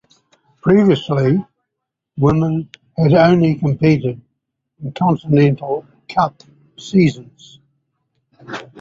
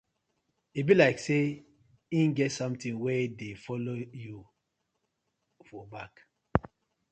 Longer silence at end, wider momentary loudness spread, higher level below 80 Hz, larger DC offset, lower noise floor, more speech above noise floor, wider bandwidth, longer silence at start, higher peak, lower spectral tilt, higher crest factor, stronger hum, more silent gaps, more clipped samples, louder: second, 0 s vs 0.45 s; second, 19 LU vs 22 LU; first, -50 dBFS vs -56 dBFS; neither; about the same, -79 dBFS vs -81 dBFS; first, 64 dB vs 52 dB; second, 7.6 kHz vs 9 kHz; about the same, 0.65 s vs 0.75 s; about the same, -2 dBFS vs -4 dBFS; first, -8.5 dB/octave vs -6.5 dB/octave; second, 16 dB vs 28 dB; neither; neither; neither; first, -16 LUFS vs -29 LUFS